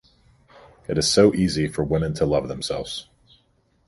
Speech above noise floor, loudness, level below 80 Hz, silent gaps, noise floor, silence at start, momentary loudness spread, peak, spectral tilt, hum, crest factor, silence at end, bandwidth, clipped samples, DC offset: 43 dB; -22 LUFS; -44 dBFS; none; -64 dBFS; 0.9 s; 14 LU; -4 dBFS; -5 dB/octave; none; 20 dB; 0.85 s; 11.5 kHz; under 0.1%; under 0.1%